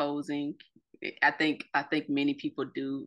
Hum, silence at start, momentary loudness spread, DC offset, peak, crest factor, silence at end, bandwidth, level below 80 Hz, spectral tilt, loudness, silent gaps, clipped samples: none; 0 s; 13 LU; under 0.1%; -12 dBFS; 20 dB; 0 s; 9.8 kHz; -80 dBFS; -5.5 dB/octave; -31 LUFS; none; under 0.1%